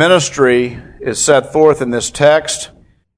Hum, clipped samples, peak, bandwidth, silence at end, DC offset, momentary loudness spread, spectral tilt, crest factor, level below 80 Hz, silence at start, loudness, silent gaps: none; 0.2%; 0 dBFS; 11 kHz; 0.5 s; under 0.1%; 11 LU; -3.5 dB/octave; 12 dB; -44 dBFS; 0 s; -13 LUFS; none